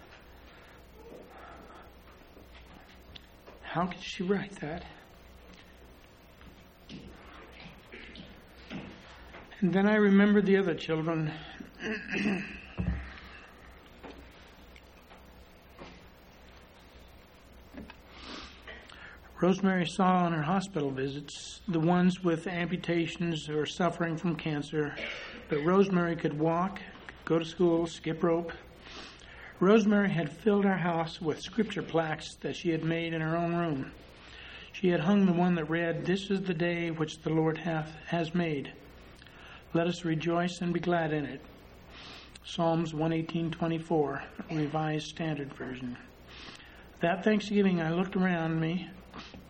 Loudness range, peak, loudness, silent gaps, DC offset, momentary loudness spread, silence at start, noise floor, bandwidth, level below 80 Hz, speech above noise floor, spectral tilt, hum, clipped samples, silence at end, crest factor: 19 LU; -10 dBFS; -30 LUFS; none; under 0.1%; 23 LU; 0 s; -55 dBFS; 9.4 kHz; -56 dBFS; 26 dB; -6.5 dB/octave; none; under 0.1%; 0 s; 22 dB